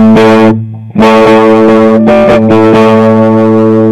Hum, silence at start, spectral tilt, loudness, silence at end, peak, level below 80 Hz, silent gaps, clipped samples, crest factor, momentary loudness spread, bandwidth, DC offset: none; 0 s; -7.5 dB/octave; -4 LUFS; 0 s; 0 dBFS; -36 dBFS; none; 10%; 4 dB; 4 LU; 10 kHz; under 0.1%